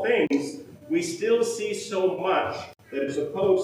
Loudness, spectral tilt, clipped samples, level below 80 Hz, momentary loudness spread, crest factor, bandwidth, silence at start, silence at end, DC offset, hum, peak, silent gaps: -26 LUFS; -4.5 dB/octave; under 0.1%; -70 dBFS; 11 LU; 16 dB; 15.5 kHz; 0 s; 0 s; under 0.1%; none; -10 dBFS; none